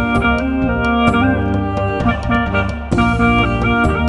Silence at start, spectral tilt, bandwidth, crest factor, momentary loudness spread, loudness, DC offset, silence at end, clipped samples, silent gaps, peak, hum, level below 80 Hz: 0 s; -7.5 dB/octave; 11 kHz; 14 dB; 5 LU; -15 LUFS; under 0.1%; 0 s; under 0.1%; none; 0 dBFS; none; -24 dBFS